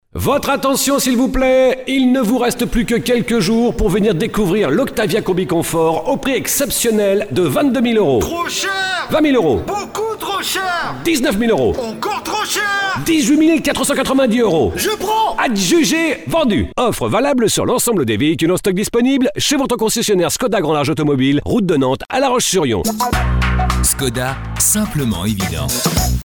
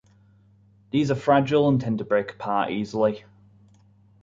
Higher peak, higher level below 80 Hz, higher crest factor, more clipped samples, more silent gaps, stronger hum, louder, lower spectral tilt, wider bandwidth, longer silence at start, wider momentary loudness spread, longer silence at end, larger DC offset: first, -2 dBFS vs -8 dBFS; first, -30 dBFS vs -60 dBFS; second, 12 dB vs 18 dB; neither; neither; neither; first, -15 LUFS vs -23 LUFS; second, -4 dB/octave vs -7.5 dB/octave; first, 19.5 kHz vs 7.6 kHz; second, 0.15 s vs 0.95 s; about the same, 5 LU vs 7 LU; second, 0.1 s vs 1.05 s; first, 0.3% vs under 0.1%